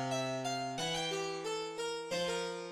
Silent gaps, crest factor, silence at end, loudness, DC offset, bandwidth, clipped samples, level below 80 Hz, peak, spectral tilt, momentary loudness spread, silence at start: none; 12 dB; 0 s; -37 LUFS; under 0.1%; 16.5 kHz; under 0.1%; -70 dBFS; -24 dBFS; -3.5 dB/octave; 3 LU; 0 s